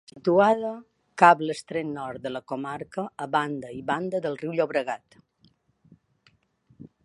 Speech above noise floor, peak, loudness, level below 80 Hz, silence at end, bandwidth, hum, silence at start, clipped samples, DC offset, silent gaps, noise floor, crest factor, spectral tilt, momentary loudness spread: 40 dB; -2 dBFS; -25 LUFS; -68 dBFS; 0.2 s; 11.5 kHz; none; 0.15 s; under 0.1%; under 0.1%; none; -65 dBFS; 24 dB; -6 dB/octave; 16 LU